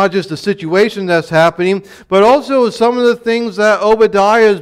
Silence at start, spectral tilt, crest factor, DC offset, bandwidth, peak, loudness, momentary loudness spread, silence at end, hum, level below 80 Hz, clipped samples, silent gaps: 0 s; -5.5 dB/octave; 10 dB; under 0.1%; 13.5 kHz; -2 dBFS; -12 LUFS; 7 LU; 0 s; none; -50 dBFS; under 0.1%; none